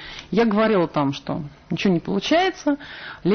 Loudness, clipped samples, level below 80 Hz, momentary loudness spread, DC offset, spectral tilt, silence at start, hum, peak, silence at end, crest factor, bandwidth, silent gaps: -22 LUFS; under 0.1%; -52 dBFS; 11 LU; under 0.1%; -6 dB/octave; 0 s; none; -8 dBFS; 0 s; 14 dB; 6.6 kHz; none